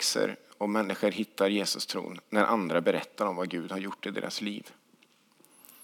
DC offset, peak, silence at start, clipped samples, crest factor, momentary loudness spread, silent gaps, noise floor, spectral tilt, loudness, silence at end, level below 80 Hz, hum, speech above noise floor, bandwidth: under 0.1%; -8 dBFS; 0 s; under 0.1%; 22 dB; 9 LU; none; -64 dBFS; -3.5 dB/octave; -30 LUFS; 0 s; under -90 dBFS; none; 34 dB; 19.5 kHz